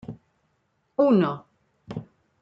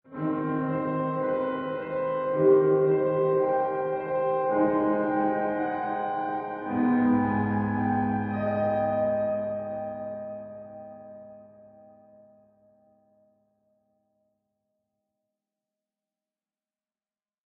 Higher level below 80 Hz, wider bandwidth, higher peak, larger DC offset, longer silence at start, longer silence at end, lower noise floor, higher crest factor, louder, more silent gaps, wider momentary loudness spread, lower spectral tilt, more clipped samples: about the same, -66 dBFS vs -64 dBFS; first, 5.8 kHz vs 4 kHz; about the same, -8 dBFS vs -10 dBFS; neither; about the same, 0.1 s vs 0.1 s; second, 0.4 s vs 5.8 s; second, -71 dBFS vs under -90 dBFS; about the same, 18 dB vs 18 dB; first, -22 LUFS vs -26 LUFS; neither; first, 19 LU vs 13 LU; first, -9.5 dB/octave vs -7.5 dB/octave; neither